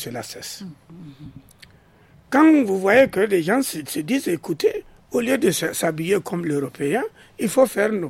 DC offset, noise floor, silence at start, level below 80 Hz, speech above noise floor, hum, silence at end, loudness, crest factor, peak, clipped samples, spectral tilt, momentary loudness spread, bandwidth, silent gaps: under 0.1%; -52 dBFS; 0 s; -58 dBFS; 32 dB; none; 0 s; -20 LUFS; 18 dB; -2 dBFS; under 0.1%; -5 dB/octave; 17 LU; 16.5 kHz; none